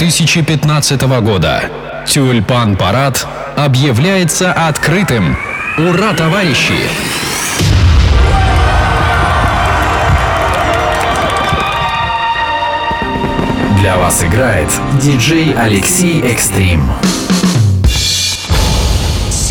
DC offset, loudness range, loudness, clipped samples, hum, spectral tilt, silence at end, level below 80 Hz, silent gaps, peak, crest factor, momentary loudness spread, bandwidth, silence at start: under 0.1%; 2 LU; -11 LUFS; under 0.1%; none; -4.5 dB/octave; 0 s; -20 dBFS; none; 0 dBFS; 10 dB; 4 LU; 17.5 kHz; 0 s